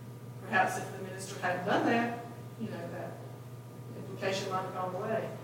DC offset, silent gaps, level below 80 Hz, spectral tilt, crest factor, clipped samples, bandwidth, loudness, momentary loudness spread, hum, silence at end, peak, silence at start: under 0.1%; none; -76 dBFS; -5 dB/octave; 20 dB; under 0.1%; 17 kHz; -34 LUFS; 16 LU; none; 0 s; -16 dBFS; 0 s